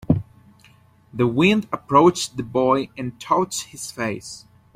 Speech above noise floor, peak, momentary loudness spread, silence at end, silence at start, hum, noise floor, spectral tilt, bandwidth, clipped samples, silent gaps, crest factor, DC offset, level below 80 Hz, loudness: 33 dB; -2 dBFS; 17 LU; 0.4 s; 0.1 s; none; -53 dBFS; -5.5 dB/octave; 15.5 kHz; under 0.1%; none; 18 dB; under 0.1%; -50 dBFS; -21 LUFS